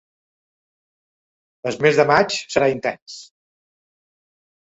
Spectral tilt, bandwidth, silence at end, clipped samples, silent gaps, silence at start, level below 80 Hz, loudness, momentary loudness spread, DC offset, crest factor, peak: -4.5 dB/octave; 8 kHz; 1.45 s; under 0.1%; 3.02-3.06 s; 1.65 s; -60 dBFS; -18 LUFS; 20 LU; under 0.1%; 22 dB; -2 dBFS